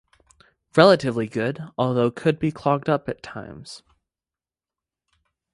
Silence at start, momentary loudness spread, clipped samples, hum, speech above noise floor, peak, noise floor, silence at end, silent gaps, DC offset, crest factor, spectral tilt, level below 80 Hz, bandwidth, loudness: 0.75 s; 22 LU; under 0.1%; none; over 69 dB; 0 dBFS; under -90 dBFS; 1.75 s; none; under 0.1%; 24 dB; -6.5 dB/octave; -58 dBFS; 11.5 kHz; -21 LUFS